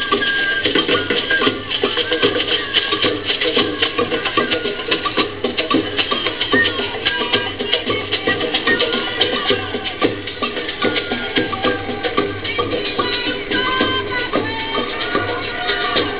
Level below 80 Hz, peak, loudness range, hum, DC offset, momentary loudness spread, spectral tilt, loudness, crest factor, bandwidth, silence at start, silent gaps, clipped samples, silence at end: -44 dBFS; -2 dBFS; 3 LU; none; 1%; 5 LU; -7.5 dB/octave; -17 LUFS; 18 dB; 4 kHz; 0 s; none; under 0.1%; 0 s